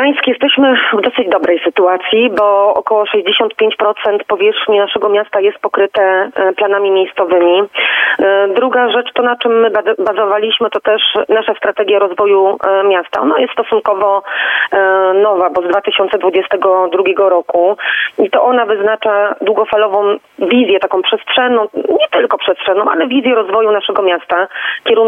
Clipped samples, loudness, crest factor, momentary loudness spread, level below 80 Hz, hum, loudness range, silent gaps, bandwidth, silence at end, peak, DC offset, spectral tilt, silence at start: under 0.1%; -12 LUFS; 10 dB; 4 LU; -60 dBFS; none; 1 LU; none; 4 kHz; 0 s; 0 dBFS; under 0.1%; -5.5 dB/octave; 0 s